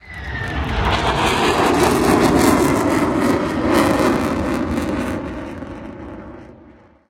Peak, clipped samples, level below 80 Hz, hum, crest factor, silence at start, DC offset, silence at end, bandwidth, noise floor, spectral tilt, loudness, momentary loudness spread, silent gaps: -2 dBFS; under 0.1%; -32 dBFS; none; 16 dB; 0.05 s; under 0.1%; 0.55 s; 17 kHz; -46 dBFS; -5 dB/octave; -17 LUFS; 18 LU; none